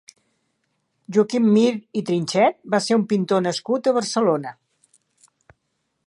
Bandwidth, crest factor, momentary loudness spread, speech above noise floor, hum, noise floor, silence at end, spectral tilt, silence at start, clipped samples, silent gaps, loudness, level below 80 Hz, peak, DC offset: 11 kHz; 18 dB; 7 LU; 54 dB; none; -74 dBFS; 1.55 s; -5.5 dB/octave; 1.1 s; under 0.1%; none; -20 LUFS; -72 dBFS; -4 dBFS; under 0.1%